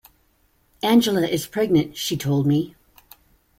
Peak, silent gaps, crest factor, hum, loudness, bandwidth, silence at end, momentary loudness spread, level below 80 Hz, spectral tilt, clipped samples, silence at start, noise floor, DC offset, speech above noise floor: -6 dBFS; none; 16 dB; none; -21 LUFS; 16.5 kHz; 0.9 s; 8 LU; -56 dBFS; -5.5 dB/octave; under 0.1%; 0.85 s; -63 dBFS; under 0.1%; 43 dB